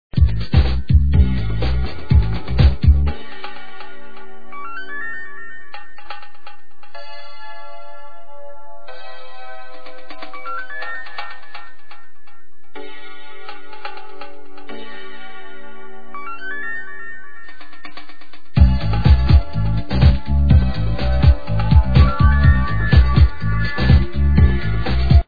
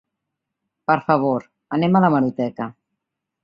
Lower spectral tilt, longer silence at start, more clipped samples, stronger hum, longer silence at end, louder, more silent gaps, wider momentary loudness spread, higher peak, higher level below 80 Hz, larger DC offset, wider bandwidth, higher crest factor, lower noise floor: about the same, -9 dB/octave vs -9.5 dB/octave; second, 0.1 s vs 0.9 s; neither; neither; second, 0 s vs 0.75 s; first, -17 LUFS vs -20 LUFS; neither; first, 24 LU vs 13 LU; first, 0 dBFS vs -4 dBFS; first, -20 dBFS vs -62 dBFS; first, 10% vs under 0.1%; about the same, 5 kHz vs 5.4 kHz; about the same, 18 dB vs 18 dB; second, -52 dBFS vs -81 dBFS